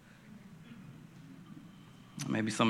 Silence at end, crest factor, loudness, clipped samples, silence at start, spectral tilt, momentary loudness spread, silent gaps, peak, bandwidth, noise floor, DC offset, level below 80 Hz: 0 s; 24 dB; -43 LUFS; under 0.1%; 0.25 s; -4.5 dB/octave; 19 LU; none; -14 dBFS; 14.5 kHz; -55 dBFS; under 0.1%; -74 dBFS